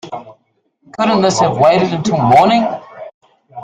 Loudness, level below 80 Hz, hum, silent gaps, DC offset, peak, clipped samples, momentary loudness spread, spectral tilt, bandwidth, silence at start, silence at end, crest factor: -12 LUFS; -50 dBFS; none; 3.14-3.21 s; under 0.1%; 0 dBFS; under 0.1%; 22 LU; -5.5 dB/octave; 10.5 kHz; 0.05 s; 0 s; 14 dB